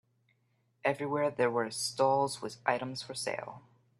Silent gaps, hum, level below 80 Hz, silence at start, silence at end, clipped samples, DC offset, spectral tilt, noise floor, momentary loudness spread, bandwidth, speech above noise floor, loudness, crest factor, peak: none; none; -78 dBFS; 0.85 s; 0.4 s; under 0.1%; under 0.1%; -4 dB/octave; -74 dBFS; 9 LU; 13.5 kHz; 42 dB; -32 LUFS; 22 dB; -12 dBFS